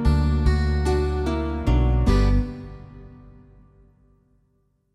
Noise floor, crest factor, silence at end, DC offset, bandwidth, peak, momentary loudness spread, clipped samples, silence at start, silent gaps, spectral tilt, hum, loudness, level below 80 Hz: -66 dBFS; 16 dB; 1.8 s; under 0.1%; 11 kHz; -6 dBFS; 19 LU; under 0.1%; 0 s; none; -8 dB/octave; none; -22 LUFS; -24 dBFS